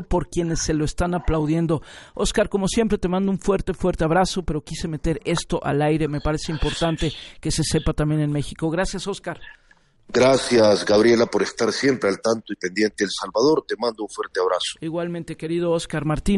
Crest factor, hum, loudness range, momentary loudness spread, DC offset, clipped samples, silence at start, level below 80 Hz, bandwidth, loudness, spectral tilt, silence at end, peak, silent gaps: 16 dB; none; 5 LU; 10 LU; under 0.1%; under 0.1%; 0 s; -36 dBFS; 11.5 kHz; -22 LUFS; -5 dB/octave; 0 s; -6 dBFS; none